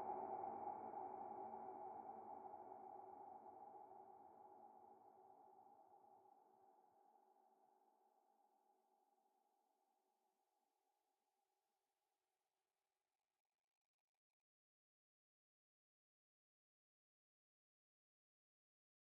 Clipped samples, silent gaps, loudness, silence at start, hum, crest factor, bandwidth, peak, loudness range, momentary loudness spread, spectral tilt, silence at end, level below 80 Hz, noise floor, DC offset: under 0.1%; none; -56 LUFS; 0 s; none; 22 dB; 2.5 kHz; -38 dBFS; 14 LU; 18 LU; -2 dB/octave; 10.3 s; under -90 dBFS; under -90 dBFS; under 0.1%